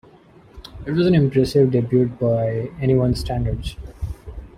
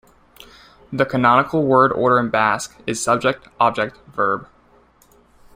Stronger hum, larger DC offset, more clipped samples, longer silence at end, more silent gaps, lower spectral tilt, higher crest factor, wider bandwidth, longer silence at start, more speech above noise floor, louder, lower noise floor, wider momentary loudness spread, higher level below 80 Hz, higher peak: neither; neither; neither; second, 0.1 s vs 1.1 s; neither; first, -8 dB/octave vs -5 dB/octave; about the same, 16 dB vs 18 dB; second, 14 kHz vs 16 kHz; second, 0.55 s vs 0.9 s; second, 30 dB vs 36 dB; about the same, -19 LUFS vs -18 LUFS; second, -48 dBFS vs -54 dBFS; first, 16 LU vs 10 LU; first, -36 dBFS vs -54 dBFS; about the same, -4 dBFS vs -2 dBFS